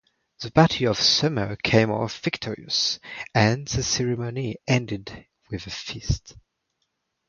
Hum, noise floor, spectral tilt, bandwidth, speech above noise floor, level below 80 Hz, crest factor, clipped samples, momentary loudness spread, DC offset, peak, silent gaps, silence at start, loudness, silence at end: none; -76 dBFS; -4.5 dB/octave; 7.2 kHz; 52 dB; -44 dBFS; 24 dB; under 0.1%; 14 LU; under 0.1%; -2 dBFS; none; 0.4 s; -23 LUFS; 0.9 s